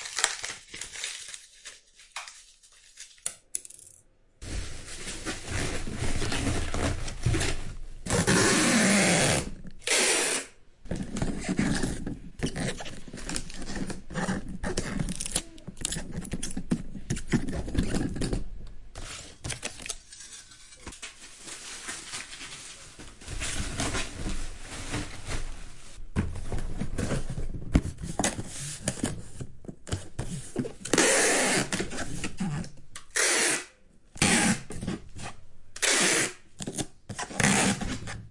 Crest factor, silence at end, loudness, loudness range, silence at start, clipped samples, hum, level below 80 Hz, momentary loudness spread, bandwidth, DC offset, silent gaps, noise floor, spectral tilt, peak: 26 dB; 0 s; -29 LUFS; 14 LU; 0 s; under 0.1%; none; -40 dBFS; 21 LU; 11.5 kHz; under 0.1%; none; -59 dBFS; -3 dB/octave; -4 dBFS